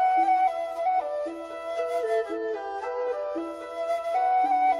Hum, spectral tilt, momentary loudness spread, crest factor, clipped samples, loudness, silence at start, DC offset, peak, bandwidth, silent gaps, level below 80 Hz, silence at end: none; -3.5 dB/octave; 11 LU; 12 dB; under 0.1%; -27 LUFS; 0 s; under 0.1%; -14 dBFS; 11.5 kHz; none; -68 dBFS; 0 s